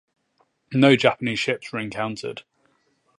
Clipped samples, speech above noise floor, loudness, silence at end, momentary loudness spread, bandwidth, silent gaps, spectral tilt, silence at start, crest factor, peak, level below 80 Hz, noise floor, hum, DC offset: under 0.1%; 46 dB; -22 LUFS; 0.8 s; 17 LU; 11 kHz; none; -5.5 dB/octave; 0.7 s; 22 dB; -2 dBFS; -64 dBFS; -67 dBFS; none; under 0.1%